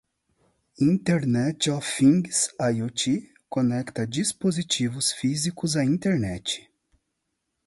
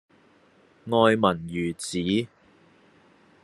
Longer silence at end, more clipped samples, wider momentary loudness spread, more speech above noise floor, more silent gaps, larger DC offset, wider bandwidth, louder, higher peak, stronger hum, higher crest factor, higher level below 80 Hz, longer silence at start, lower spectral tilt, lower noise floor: about the same, 1.05 s vs 1.15 s; neither; second, 8 LU vs 13 LU; first, 55 dB vs 35 dB; neither; neither; about the same, 11.5 kHz vs 12.5 kHz; about the same, -24 LUFS vs -24 LUFS; second, -8 dBFS vs -4 dBFS; neither; second, 18 dB vs 24 dB; first, -58 dBFS vs -66 dBFS; about the same, 0.8 s vs 0.85 s; about the same, -4.5 dB/octave vs -5.5 dB/octave; first, -79 dBFS vs -59 dBFS